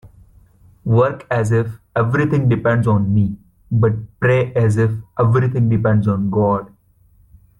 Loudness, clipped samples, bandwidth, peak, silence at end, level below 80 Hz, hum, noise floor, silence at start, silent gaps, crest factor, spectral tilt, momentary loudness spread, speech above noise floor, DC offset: -17 LUFS; under 0.1%; 10.5 kHz; -4 dBFS; 0.95 s; -46 dBFS; none; -53 dBFS; 0.05 s; none; 12 dB; -9 dB/octave; 5 LU; 37 dB; under 0.1%